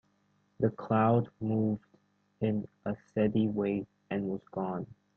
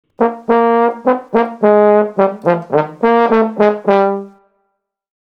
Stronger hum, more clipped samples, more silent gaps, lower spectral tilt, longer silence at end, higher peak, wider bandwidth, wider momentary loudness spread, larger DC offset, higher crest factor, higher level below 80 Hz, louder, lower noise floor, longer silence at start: neither; neither; neither; first, -10.5 dB/octave vs -8.5 dB/octave; second, 0.25 s vs 1.1 s; second, -14 dBFS vs 0 dBFS; second, 4.2 kHz vs 6 kHz; first, 10 LU vs 6 LU; neither; about the same, 18 dB vs 14 dB; second, -66 dBFS vs -56 dBFS; second, -32 LUFS vs -13 LUFS; about the same, -72 dBFS vs -69 dBFS; first, 0.6 s vs 0.2 s